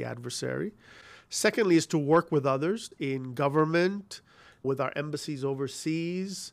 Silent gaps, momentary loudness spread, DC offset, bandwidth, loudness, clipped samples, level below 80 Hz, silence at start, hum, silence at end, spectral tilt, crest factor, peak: none; 11 LU; under 0.1%; 15 kHz; -29 LUFS; under 0.1%; -72 dBFS; 0 s; none; 0.05 s; -5 dB/octave; 18 dB; -12 dBFS